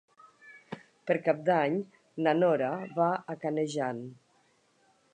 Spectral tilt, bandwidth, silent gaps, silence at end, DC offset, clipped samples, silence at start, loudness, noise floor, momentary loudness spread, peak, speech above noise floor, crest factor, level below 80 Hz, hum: -6.5 dB/octave; 9.8 kHz; none; 1 s; under 0.1%; under 0.1%; 0.45 s; -29 LUFS; -68 dBFS; 18 LU; -10 dBFS; 39 dB; 20 dB; -84 dBFS; none